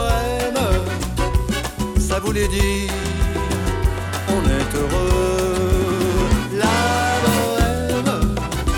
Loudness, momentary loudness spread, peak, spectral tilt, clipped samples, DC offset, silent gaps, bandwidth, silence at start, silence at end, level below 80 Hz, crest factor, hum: -20 LUFS; 5 LU; -6 dBFS; -5 dB/octave; under 0.1%; under 0.1%; none; 20 kHz; 0 s; 0 s; -24 dBFS; 12 dB; none